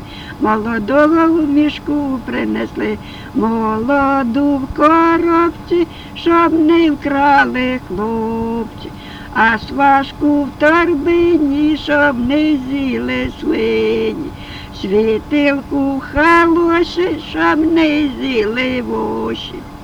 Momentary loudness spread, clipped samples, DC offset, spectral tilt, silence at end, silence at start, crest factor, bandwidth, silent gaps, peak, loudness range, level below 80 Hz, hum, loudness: 10 LU; under 0.1%; under 0.1%; -6.5 dB/octave; 0 s; 0 s; 14 dB; 10 kHz; none; 0 dBFS; 3 LU; -38 dBFS; none; -14 LUFS